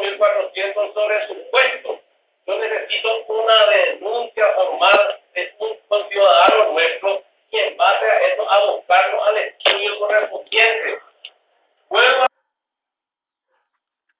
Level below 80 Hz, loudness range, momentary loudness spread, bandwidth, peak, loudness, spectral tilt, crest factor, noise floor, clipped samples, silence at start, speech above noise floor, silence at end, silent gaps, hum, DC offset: -76 dBFS; 4 LU; 12 LU; 4 kHz; 0 dBFS; -17 LUFS; -3.5 dB/octave; 18 dB; -88 dBFS; under 0.1%; 0 s; 69 dB; 1.95 s; none; none; under 0.1%